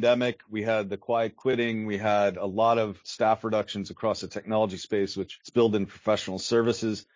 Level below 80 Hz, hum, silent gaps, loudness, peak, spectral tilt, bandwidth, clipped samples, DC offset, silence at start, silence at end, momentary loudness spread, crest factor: -60 dBFS; none; none; -27 LUFS; -10 dBFS; -5.5 dB/octave; 7.6 kHz; under 0.1%; under 0.1%; 0 s; 0.15 s; 6 LU; 16 dB